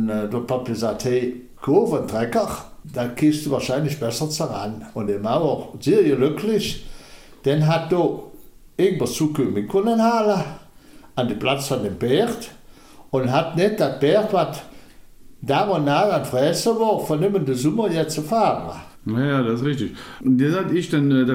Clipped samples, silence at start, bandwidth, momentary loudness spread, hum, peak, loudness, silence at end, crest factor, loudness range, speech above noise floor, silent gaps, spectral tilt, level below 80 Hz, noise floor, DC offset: under 0.1%; 0 s; 16.5 kHz; 10 LU; none; -4 dBFS; -21 LUFS; 0 s; 16 dB; 2 LU; 25 dB; none; -6 dB/octave; -50 dBFS; -45 dBFS; under 0.1%